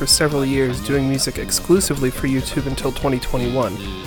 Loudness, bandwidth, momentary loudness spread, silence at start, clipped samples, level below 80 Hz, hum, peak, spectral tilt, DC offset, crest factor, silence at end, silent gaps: -19 LUFS; 19 kHz; 6 LU; 0 s; under 0.1%; -32 dBFS; none; 0 dBFS; -4 dB/octave; under 0.1%; 18 dB; 0 s; none